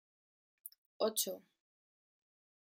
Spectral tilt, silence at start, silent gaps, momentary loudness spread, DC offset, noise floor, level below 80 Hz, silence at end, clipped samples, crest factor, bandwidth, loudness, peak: -1.5 dB/octave; 0.65 s; 0.78-1.00 s; 19 LU; under 0.1%; under -90 dBFS; under -90 dBFS; 1.35 s; under 0.1%; 24 dB; 16.5 kHz; -37 LUFS; -22 dBFS